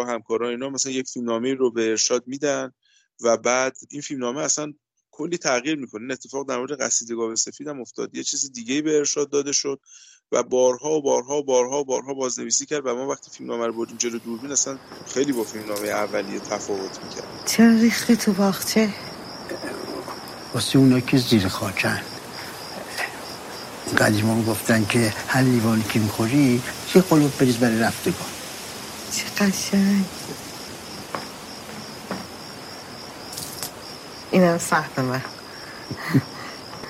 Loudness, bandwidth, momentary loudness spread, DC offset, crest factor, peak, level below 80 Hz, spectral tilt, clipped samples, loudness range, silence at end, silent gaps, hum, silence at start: -23 LUFS; 16 kHz; 16 LU; under 0.1%; 22 dB; 0 dBFS; -58 dBFS; -4 dB/octave; under 0.1%; 6 LU; 0 s; none; none; 0 s